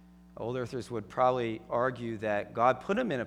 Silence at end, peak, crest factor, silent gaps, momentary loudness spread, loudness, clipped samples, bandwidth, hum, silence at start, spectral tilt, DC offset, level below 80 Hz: 0 s; -12 dBFS; 20 dB; none; 9 LU; -31 LUFS; under 0.1%; 11.5 kHz; none; 0.35 s; -6.5 dB/octave; under 0.1%; -62 dBFS